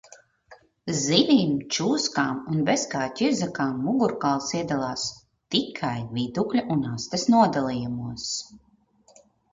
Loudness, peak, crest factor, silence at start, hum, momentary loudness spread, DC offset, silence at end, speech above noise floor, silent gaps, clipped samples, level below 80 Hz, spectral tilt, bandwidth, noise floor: -25 LUFS; -4 dBFS; 22 dB; 0.1 s; none; 10 LU; under 0.1%; 0.95 s; 36 dB; none; under 0.1%; -60 dBFS; -4.5 dB/octave; 7.6 kHz; -60 dBFS